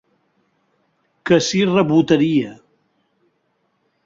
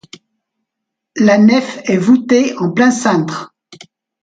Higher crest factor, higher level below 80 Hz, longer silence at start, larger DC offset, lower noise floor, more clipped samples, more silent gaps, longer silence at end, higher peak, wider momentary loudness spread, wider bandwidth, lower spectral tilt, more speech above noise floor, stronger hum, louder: about the same, 18 dB vs 14 dB; about the same, -58 dBFS vs -60 dBFS; about the same, 1.25 s vs 1.15 s; neither; second, -67 dBFS vs -78 dBFS; neither; neither; first, 1.5 s vs 0.5 s; about the same, -2 dBFS vs 0 dBFS; about the same, 11 LU vs 10 LU; second, 7.8 kHz vs 9.2 kHz; about the same, -5.5 dB/octave vs -5.5 dB/octave; second, 52 dB vs 67 dB; neither; second, -16 LUFS vs -12 LUFS